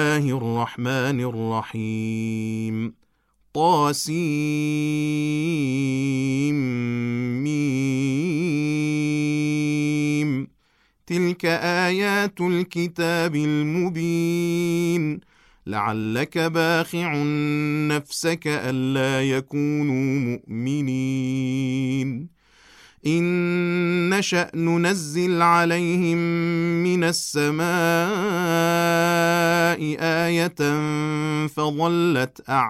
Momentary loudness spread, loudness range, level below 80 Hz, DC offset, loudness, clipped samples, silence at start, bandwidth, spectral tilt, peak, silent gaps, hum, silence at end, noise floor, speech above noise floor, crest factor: 7 LU; 4 LU; -62 dBFS; under 0.1%; -22 LUFS; under 0.1%; 0 s; 15 kHz; -5.5 dB/octave; -6 dBFS; none; none; 0 s; -64 dBFS; 42 dB; 16 dB